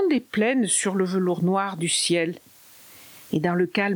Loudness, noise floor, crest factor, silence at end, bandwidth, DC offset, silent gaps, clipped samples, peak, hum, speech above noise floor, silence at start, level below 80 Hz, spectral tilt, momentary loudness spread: -23 LUFS; -49 dBFS; 16 dB; 0 s; over 20 kHz; under 0.1%; none; under 0.1%; -8 dBFS; none; 26 dB; 0 s; -68 dBFS; -4 dB/octave; 9 LU